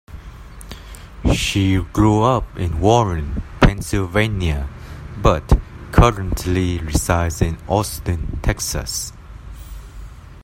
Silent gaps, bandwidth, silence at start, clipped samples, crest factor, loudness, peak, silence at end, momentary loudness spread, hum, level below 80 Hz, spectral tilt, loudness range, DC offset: none; 16.5 kHz; 0.1 s; under 0.1%; 18 dB; -19 LUFS; 0 dBFS; 0 s; 22 LU; none; -26 dBFS; -5.5 dB/octave; 4 LU; under 0.1%